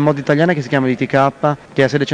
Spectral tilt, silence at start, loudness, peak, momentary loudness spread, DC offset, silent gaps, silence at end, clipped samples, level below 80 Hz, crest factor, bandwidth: -7 dB/octave; 0 s; -16 LUFS; 0 dBFS; 3 LU; under 0.1%; none; 0 s; under 0.1%; -52 dBFS; 14 dB; 9.8 kHz